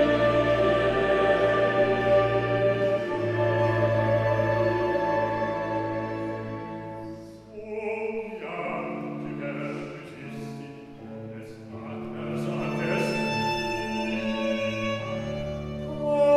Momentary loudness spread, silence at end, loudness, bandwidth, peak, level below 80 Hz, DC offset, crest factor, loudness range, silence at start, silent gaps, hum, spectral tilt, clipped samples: 17 LU; 0 s; -26 LUFS; 12 kHz; -10 dBFS; -50 dBFS; under 0.1%; 16 dB; 12 LU; 0 s; none; none; -6.5 dB/octave; under 0.1%